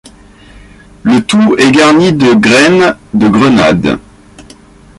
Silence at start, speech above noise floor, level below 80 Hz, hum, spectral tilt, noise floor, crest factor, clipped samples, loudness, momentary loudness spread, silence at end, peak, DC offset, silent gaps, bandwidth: 1.05 s; 30 dB; -38 dBFS; none; -5 dB/octave; -37 dBFS; 8 dB; under 0.1%; -7 LUFS; 7 LU; 0.6 s; 0 dBFS; under 0.1%; none; 11.5 kHz